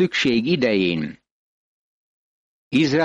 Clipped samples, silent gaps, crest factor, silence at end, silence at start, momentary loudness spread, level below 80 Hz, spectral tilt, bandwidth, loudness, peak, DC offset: under 0.1%; 1.31-2.71 s; 14 dB; 0 s; 0 s; 8 LU; -58 dBFS; -5.5 dB/octave; 9 kHz; -20 LUFS; -8 dBFS; under 0.1%